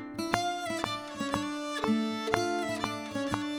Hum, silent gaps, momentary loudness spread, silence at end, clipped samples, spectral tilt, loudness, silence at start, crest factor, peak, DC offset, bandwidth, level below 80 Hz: none; none; 5 LU; 0 s; under 0.1%; -4 dB/octave; -32 LUFS; 0 s; 28 dB; -4 dBFS; under 0.1%; over 20 kHz; -58 dBFS